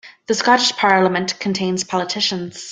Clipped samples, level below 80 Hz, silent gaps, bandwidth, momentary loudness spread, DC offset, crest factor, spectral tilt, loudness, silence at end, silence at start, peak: under 0.1%; -62 dBFS; none; 9.6 kHz; 7 LU; under 0.1%; 16 dB; -3.5 dB/octave; -17 LUFS; 0 s; 0.05 s; -2 dBFS